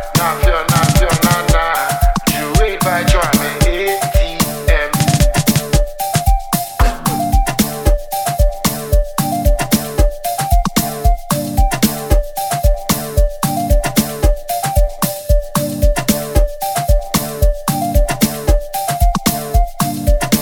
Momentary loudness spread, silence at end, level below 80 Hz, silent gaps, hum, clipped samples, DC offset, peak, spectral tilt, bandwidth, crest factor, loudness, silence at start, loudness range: 5 LU; 0 s; -16 dBFS; none; none; under 0.1%; under 0.1%; 0 dBFS; -4.5 dB/octave; 19.5 kHz; 14 dB; -16 LUFS; 0 s; 3 LU